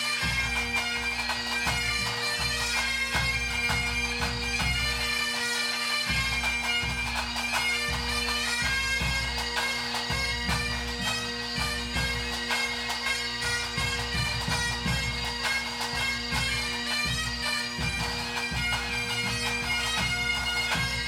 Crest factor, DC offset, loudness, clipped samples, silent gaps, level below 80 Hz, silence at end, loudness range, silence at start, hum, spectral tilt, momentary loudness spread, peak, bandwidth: 16 dB; under 0.1%; -27 LUFS; under 0.1%; none; -40 dBFS; 0 s; 2 LU; 0 s; none; -2 dB/octave; 3 LU; -14 dBFS; 16.5 kHz